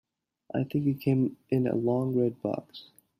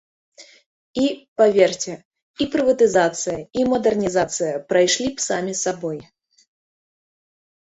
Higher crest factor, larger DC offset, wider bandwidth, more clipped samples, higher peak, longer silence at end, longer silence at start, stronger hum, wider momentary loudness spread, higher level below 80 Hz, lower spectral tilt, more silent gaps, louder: about the same, 16 dB vs 20 dB; neither; first, 15 kHz vs 8.4 kHz; neither; second, -14 dBFS vs -2 dBFS; second, 0.4 s vs 1.75 s; first, 0.55 s vs 0.4 s; neither; about the same, 10 LU vs 12 LU; second, -68 dBFS vs -56 dBFS; first, -9.5 dB/octave vs -3.5 dB/octave; second, none vs 0.66-0.94 s, 1.28-1.36 s, 2.05-2.11 s, 2.22-2.34 s; second, -29 LUFS vs -20 LUFS